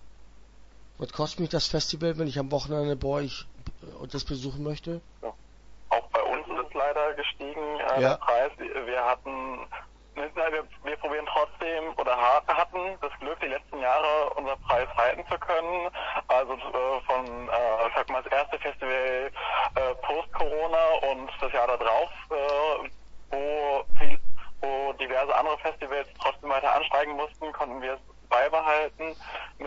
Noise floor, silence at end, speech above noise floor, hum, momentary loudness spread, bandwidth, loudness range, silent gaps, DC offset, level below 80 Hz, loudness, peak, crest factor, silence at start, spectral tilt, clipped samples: -49 dBFS; 0 s; 23 dB; none; 12 LU; 7.8 kHz; 4 LU; none; under 0.1%; -46 dBFS; -28 LUFS; -6 dBFS; 20 dB; 0 s; -4.5 dB/octave; under 0.1%